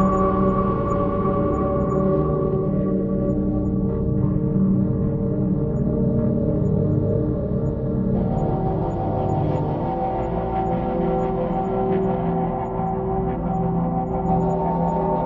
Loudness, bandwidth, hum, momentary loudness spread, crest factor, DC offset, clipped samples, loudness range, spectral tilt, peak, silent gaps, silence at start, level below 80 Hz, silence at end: -22 LUFS; 7.2 kHz; none; 4 LU; 14 dB; under 0.1%; under 0.1%; 2 LU; -11 dB/octave; -8 dBFS; none; 0 s; -34 dBFS; 0 s